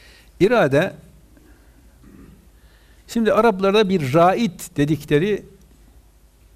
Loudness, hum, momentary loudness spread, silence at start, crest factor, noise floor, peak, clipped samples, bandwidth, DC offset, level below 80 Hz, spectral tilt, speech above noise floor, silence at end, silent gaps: -18 LUFS; none; 8 LU; 0.4 s; 16 dB; -52 dBFS; -6 dBFS; under 0.1%; 15.5 kHz; under 0.1%; -48 dBFS; -6.5 dB/octave; 34 dB; 1.15 s; none